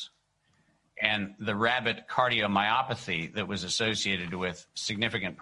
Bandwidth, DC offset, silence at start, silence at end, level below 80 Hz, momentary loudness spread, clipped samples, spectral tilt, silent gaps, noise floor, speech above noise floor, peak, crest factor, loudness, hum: 11.5 kHz; under 0.1%; 0 s; 0 s; -60 dBFS; 8 LU; under 0.1%; -3.5 dB/octave; none; -71 dBFS; 41 dB; -6 dBFS; 24 dB; -29 LUFS; none